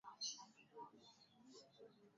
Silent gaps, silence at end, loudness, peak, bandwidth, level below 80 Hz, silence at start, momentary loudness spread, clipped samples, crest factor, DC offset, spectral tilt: none; 0 s; -55 LUFS; -36 dBFS; 7.4 kHz; under -90 dBFS; 0.05 s; 18 LU; under 0.1%; 22 dB; under 0.1%; -0.5 dB/octave